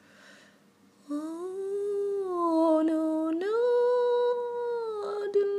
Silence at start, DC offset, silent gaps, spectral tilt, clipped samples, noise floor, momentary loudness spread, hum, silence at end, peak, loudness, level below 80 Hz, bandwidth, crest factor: 0.3 s; under 0.1%; none; -5 dB/octave; under 0.1%; -61 dBFS; 11 LU; none; 0 s; -14 dBFS; -28 LUFS; -90 dBFS; 11 kHz; 14 dB